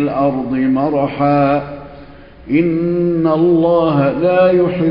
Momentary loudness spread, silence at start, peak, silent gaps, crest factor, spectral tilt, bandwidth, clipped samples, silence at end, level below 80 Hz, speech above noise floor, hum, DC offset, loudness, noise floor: 5 LU; 0 s; -2 dBFS; none; 12 dB; -11.5 dB/octave; 5.4 kHz; under 0.1%; 0 s; -44 dBFS; 24 dB; none; under 0.1%; -14 LUFS; -37 dBFS